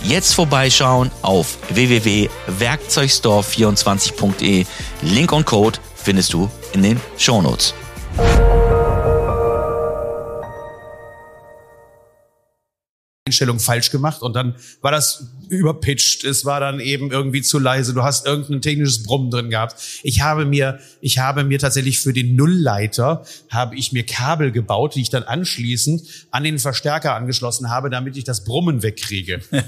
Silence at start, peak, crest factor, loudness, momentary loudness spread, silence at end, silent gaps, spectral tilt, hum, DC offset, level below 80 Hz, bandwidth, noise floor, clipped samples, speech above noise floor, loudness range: 0 s; 0 dBFS; 18 dB; -17 LUFS; 10 LU; 0 s; 12.89-13.26 s; -4 dB/octave; none; under 0.1%; -30 dBFS; 15.5 kHz; -70 dBFS; under 0.1%; 53 dB; 5 LU